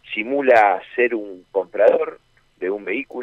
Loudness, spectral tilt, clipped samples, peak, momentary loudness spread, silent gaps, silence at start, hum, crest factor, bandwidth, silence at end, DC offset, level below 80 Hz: -19 LUFS; -5.5 dB/octave; under 0.1%; -4 dBFS; 13 LU; none; 0.05 s; none; 16 dB; 7.6 kHz; 0 s; under 0.1%; -64 dBFS